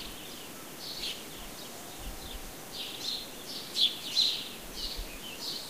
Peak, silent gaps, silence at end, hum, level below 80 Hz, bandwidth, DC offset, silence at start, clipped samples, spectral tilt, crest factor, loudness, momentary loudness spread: -14 dBFS; none; 0 s; none; -50 dBFS; 15.5 kHz; 0.2%; 0 s; under 0.1%; -1 dB/octave; 24 dB; -34 LUFS; 16 LU